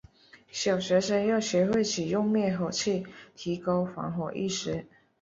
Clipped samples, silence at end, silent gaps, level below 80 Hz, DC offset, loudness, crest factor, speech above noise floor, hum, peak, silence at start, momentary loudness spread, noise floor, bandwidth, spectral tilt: under 0.1%; 0.35 s; none; -62 dBFS; under 0.1%; -28 LUFS; 16 dB; 27 dB; none; -12 dBFS; 0.55 s; 10 LU; -55 dBFS; 7.8 kHz; -5 dB/octave